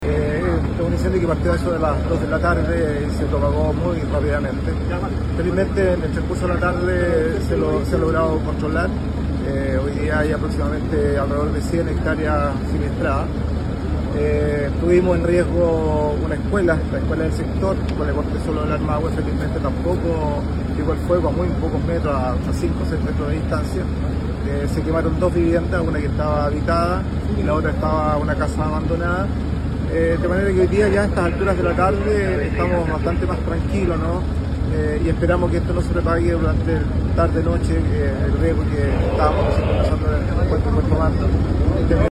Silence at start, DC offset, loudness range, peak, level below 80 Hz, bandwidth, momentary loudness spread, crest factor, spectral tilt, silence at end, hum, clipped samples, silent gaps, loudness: 0 s; under 0.1%; 2 LU; -4 dBFS; -26 dBFS; 11.5 kHz; 4 LU; 16 dB; -8 dB/octave; 0 s; none; under 0.1%; none; -20 LUFS